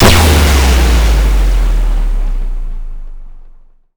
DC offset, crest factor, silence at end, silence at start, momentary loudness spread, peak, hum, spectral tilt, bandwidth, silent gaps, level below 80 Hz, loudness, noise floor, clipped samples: under 0.1%; 8 dB; 0.45 s; 0 s; 20 LU; -2 dBFS; none; -4.5 dB/octave; over 20 kHz; none; -12 dBFS; -12 LUFS; -38 dBFS; under 0.1%